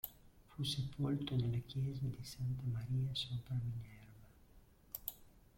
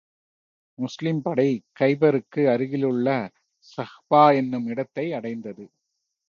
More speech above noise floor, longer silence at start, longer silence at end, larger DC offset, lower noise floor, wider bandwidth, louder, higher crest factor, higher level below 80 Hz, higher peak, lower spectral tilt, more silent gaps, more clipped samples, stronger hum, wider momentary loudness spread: second, 25 dB vs 57 dB; second, 0.05 s vs 0.8 s; second, 0.2 s vs 0.65 s; neither; second, -65 dBFS vs -79 dBFS; first, 16.5 kHz vs 7.2 kHz; second, -42 LUFS vs -23 LUFS; about the same, 20 dB vs 20 dB; first, -62 dBFS vs -72 dBFS; second, -22 dBFS vs -4 dBFS; second, -6 dB/octave vs -8 dB/octave; neither; neither; neither; second, 15 LU vs 18 LU